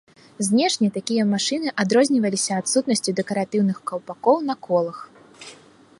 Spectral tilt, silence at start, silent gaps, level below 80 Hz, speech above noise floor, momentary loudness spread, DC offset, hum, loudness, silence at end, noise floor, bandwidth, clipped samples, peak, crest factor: -4 dB/octave; 0.4 s; none; -72 dBFS; 27 dB; 12 LU; under 0.1%; none; -21 LUFS; 0.45 s; -49 dBFS; 11.5 kHz; under 0.1%; -4 dBFS; 18 dB